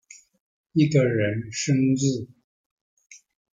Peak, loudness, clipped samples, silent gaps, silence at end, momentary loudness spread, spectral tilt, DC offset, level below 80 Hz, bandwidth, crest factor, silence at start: -8 dBFS; -23 LUFS; under 0.1%; 2.44-2.97 s; 0.35 s; 9 LU; -6 dB/octave; under 0.1%; -62 dBFS; 9.4 kHz; 18 dB; 0.75 s